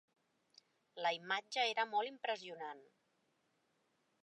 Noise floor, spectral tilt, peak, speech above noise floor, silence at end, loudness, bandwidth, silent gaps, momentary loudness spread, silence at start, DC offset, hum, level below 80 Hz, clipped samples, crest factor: -80 dBFS; -1.5 dB/octave; -22 dBFS; 40 dB; 1.4 s; -39 LUFS; 10.5 kHz; none; 14 LU; 0.95 s; under 0.1%; none; under -90 dBFS; under 0.1%; 22 dB